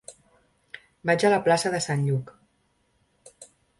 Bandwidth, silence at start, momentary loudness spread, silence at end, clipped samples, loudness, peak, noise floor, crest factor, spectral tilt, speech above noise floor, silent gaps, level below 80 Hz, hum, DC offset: 11.5 kHz; 0.1 s; 25 LU; 0.35 s; under 0.1%; -24 LUFS; -8 dBFS; -69 dBFS; 20 dB; -5 dB/octave; 46 dB; none; -64 dBFS; none; under 0.1%